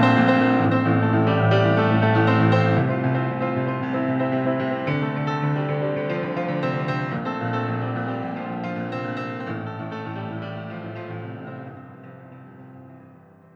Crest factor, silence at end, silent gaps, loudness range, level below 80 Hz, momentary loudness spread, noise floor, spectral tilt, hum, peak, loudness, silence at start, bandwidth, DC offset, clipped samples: 18 dB; 0.4 s; none; 14 LU; -62 dBFS; 16 LU; -49 dBFS; -8.5 dB/octave; none; -6 dBFS; -22 LUFS; 0 s; 6.8 kHz; under 0.1%; under 0.1%